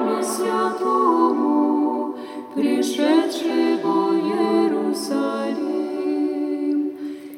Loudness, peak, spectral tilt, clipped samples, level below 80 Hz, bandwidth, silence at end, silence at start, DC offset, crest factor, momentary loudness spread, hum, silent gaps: -21 LUFS; -6 dBFS; -4.5 dB/octave; under 0.1%; -80 dBFS; 16.5 kHz; 0 s; 0 s; under 0.1%; 14 dB; 6 LU; none; none